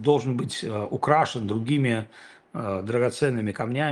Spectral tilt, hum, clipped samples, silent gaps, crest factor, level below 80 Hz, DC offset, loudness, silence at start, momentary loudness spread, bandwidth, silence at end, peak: -6 dB/octave; none; under 0.1%; none; 20 dB; -64 dBFS; under 0.1%; -25 LUFS; 0 s; 8 LU; 12 kHz; 0 s; -4 dBFS